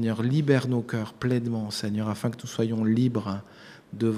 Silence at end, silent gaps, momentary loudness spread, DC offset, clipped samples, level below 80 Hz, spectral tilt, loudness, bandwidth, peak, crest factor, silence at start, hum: 0 s; none; 10 LU; under 0.1%; under 0.1%; -64 dBFS; -7 dB/octave; -27 LUFS; 15 kHz; -6 dBFS; 20 dB; 0 s; none